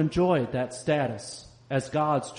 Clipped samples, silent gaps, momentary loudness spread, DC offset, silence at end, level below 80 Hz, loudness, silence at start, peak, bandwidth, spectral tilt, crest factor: under 0.1%; none; 14 LU; under 0.1%; 0 s; -52 dBFS; -27 LUFS; 0 s; -12 dBFS; 10 kHz; -6 dB/octave; 16 dB